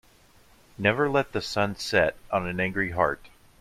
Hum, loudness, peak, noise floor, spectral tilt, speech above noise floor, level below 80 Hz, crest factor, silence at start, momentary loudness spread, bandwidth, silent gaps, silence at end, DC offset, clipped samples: none; -26 LUFS; -6 dBFS; -57 dBFS; -5 dB/octave; 31 dB; -52 dBFS; 20 dB; 0.8 s; 5 LU; 15.5 kHz; none; 0.3 s; under 0.1%; under 0.1%